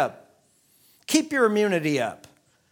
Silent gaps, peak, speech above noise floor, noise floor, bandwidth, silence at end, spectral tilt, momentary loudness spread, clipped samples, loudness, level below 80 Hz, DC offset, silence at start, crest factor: none; -6 dBFS; 40 dB; -62 dBFS; 19.5 kHz; 0.55 s; -4 dB/octave; 10 LU; under 0.1%; -23 LUFS; -72 dBFS; under 0.1%; 0 s; 20 dB